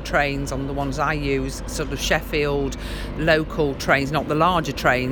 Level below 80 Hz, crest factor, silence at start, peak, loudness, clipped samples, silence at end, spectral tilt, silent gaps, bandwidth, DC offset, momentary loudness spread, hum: -34 dBFS; 20 dB; 0 s; -2 dBFS; -22 LUFS; under 0.1%; 0 s; -5 dB/octave; none; 20 kHz; under 0.1%; 8 LU; none